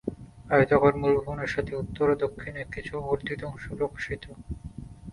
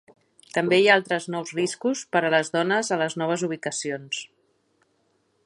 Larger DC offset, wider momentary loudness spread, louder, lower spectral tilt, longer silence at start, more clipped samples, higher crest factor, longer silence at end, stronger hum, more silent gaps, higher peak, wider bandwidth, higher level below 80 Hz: neither; first, 19 LU vs 11 LU; second, -27 LUFS vs -24 LUFS; first, -7.5 dB/octave vs -3.5 dB/octave; second, 0.05 s vs 0.55 s; neither; about the same, 22 dB vs 22 dB; second, 0 s vs 1.2 s; neither; neither; about the same, -6 dBFS vs -4 dBFS; about the same, 11 kHz vs 11.5 kHz; first, -46 dBFS vs -74 dBFS